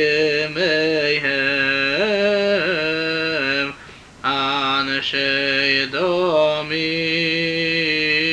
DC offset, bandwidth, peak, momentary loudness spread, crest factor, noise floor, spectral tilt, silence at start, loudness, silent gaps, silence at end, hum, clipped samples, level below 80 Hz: under 0.1%; 10.5 kHz; -4 dBFS; 4 LU; 14 dB; -41 dBFS; -4.5 dB/octave; 0 s; -18 LUFS; none; 0 s; none; under 0.1%; -54 dBFS